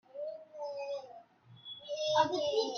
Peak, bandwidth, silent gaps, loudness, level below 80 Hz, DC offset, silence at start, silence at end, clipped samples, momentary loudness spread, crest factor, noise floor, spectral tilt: -16 dBFS; 7 kHz; none; -35 LUFS; -80 dBFS; under 0.1%; 0.15 s; 0 s; under 0.1%; 18 LU; 20 dB; -57 dBFS; -3 dB/octave